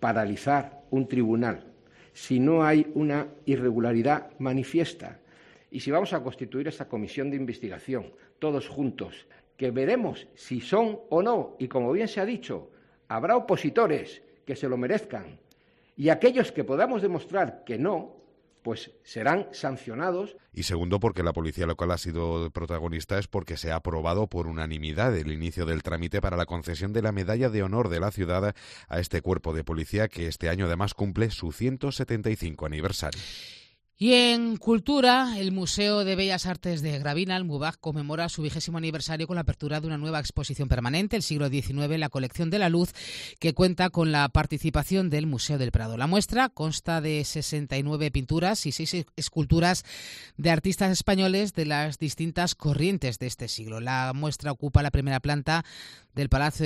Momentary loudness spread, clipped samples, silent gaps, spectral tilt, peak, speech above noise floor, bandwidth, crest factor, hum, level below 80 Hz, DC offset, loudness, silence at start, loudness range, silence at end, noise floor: 10 LU; under 0.1%; none; -5.5 dB/octave; -6 dBFS; 36 dB; 14 kHz; 22 dB; none; -44 dBFS; under 0.1%; -27 LUFS; 0 s; 5 LU; 0 s; -63 dBFS